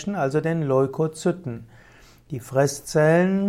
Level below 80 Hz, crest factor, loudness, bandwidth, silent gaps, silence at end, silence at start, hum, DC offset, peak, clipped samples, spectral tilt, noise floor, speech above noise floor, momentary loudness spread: -56 dBFS; 16 dB; -22 LUFS; 16 kHz; none; 0 s; 0 s; none; under 0.1%; -8 dBFS; under 0.1%; -6.5 dB/octave; -51 dBFS; 29 dB; 17 LU